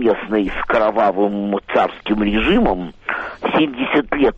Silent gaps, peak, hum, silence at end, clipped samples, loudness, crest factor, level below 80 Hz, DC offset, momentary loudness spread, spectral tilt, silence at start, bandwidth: none; -4 dBFS; none; 0 s; under 0.1%; -18 LUFS; 12 dB; -36 dBFS; under 0.1%; 7 LU; -7.5 dB/octave; 0 s; 7.4 kHz